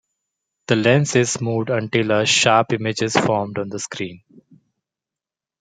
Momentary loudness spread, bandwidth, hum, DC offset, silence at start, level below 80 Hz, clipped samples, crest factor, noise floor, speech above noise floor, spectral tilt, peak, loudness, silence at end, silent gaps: 12 LU; 9.6 kHz; none; under 0.1%; 0.7 s; -62 dBFS; under 0.1%; 18 dB; -89 dBFS; 70 dB; -4 dB/octave; -2 dBFS; -18 LUFS; 1.45 s; none